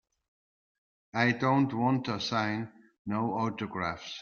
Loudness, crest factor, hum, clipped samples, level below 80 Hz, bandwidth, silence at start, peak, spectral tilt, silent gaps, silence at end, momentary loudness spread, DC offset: -30 LUFS; 20 dB; none; under 0.1%; -68 dBFS; 7 kHz; 1.15 s; -12 dBFS; -6 dB/octave; 2.99-3.05 s; 0 s; 11 LU; under 0.1%